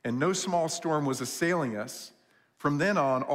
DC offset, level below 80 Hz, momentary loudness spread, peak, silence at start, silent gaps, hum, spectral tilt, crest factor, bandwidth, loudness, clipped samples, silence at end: under 0.1%; -70 dBFS; 11 LU; -14 dBFS; 0.05 s; none; none; -4.5 dB/octave; 16 dB; 16 kHz; -29 LUFS; under 0.1%; 0 s